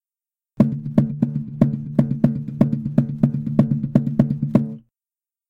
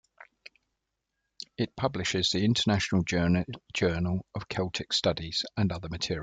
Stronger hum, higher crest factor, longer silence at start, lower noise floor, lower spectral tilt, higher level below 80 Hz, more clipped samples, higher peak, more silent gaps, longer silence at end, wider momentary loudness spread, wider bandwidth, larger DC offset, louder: neither; about the same, 16 dB vs 18 dB; first, 0.6 s vs 0.2 s; first, under -90 dBFS vs -83 dBFS; first, -11 dB/octave vs -5 dB/octave; first, -48 dBFS vs -54 dBFS; neither; first, -4 dBFS vs -12 dBFS; neither; first, 0.7 s vs 0 s; second, 3 LU vs 9 LU; second, 4.5 kHz vs 9.4 kHz; neither; first, -21 LUFS vs -29 LUFS